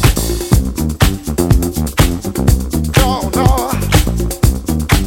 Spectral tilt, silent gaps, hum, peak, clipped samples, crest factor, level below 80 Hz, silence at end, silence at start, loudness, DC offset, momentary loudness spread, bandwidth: -5 dB/octave; none; none; 0 dBFS; under 0.1%; 12 dB; -18 dBFS; 0 s; 0 s; -15 LUFS; under 0.1%; 4 LU; 17 kHz